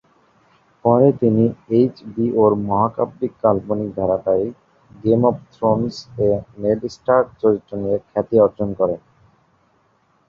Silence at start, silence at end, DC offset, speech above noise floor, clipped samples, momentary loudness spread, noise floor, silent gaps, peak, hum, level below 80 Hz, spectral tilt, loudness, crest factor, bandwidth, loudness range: 0.85 s; 1.3 s; under 0.1%; 43 dB; under 0.1%; 7 LU; -61 dBFS; none; -2 dBFS; none; -50 dBFS; -9 dB/octave; -19 LUFS; 18 dB; 7.2 kHz; 3 LU